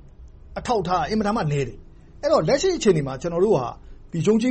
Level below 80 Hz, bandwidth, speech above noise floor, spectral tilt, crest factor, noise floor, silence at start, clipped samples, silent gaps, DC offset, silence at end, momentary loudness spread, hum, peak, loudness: -44 dBFS; 8.8 kHz; 23 dB; -6 dB/octave; 16 dB; -44 dBFS; 0.2 s; under 0.1%; none; under 0.1%; 0 s; 13 LU; none; -8 dBFS; -22 LUFS